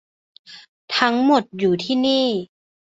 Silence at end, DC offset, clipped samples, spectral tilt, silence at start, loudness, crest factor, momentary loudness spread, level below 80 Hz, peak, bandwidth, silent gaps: 0.45 s; under 0.1%; under 0.1%; -5 dB/octave; 0.5 s; -19 LUFS; 20 dB; 6 LU; -64 dBFS; 0 dBFS; 7.8 kHz; 0.68-0.88 s